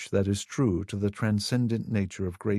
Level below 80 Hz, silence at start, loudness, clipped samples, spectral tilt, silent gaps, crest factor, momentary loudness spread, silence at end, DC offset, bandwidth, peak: -46 dBFS; 0 s; -28 LUFS; under 0.1%; -6 dB/octave; none; 16 dB; 5 LU; 0 s; under 0.1%; 13.5 kHz; -12 dBFS